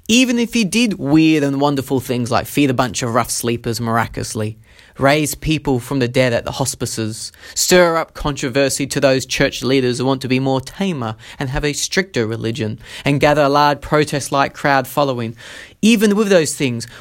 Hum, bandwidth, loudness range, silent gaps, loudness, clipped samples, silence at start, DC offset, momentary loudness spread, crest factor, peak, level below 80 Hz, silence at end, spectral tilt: none; 17 kHz; 3 LU; none; -17 LUFS; under 0.1%; 0.1 s; under 0.1%; 10 LU; 16 dB; 0 dBFS; -40 dBFS; 0 s; -4.5 dB/octave